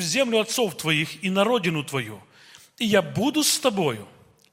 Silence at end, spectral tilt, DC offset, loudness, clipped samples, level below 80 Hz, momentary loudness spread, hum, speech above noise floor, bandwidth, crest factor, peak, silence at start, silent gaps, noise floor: 0.45 s; -3.5 dB/octave; under 0.1%; -23 LUFS; under 0.1%; -66 dBFS; 9 LU; none; 28 dB; 16.5 kHz; 20 dB; -6 dBFS; 0 s; none; -51 dBFS